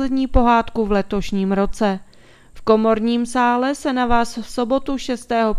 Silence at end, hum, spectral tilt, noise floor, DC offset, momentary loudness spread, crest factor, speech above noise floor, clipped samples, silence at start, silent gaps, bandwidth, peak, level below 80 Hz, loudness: 0 s; none; -6 dB/octave; -46 dBFS; under 0.1%; 9 LU; 18 dB; 28 dB; under 0.1%; 0 s; none; 13 kHz; 0 dBFS; -32 dBFS; -19 LUFS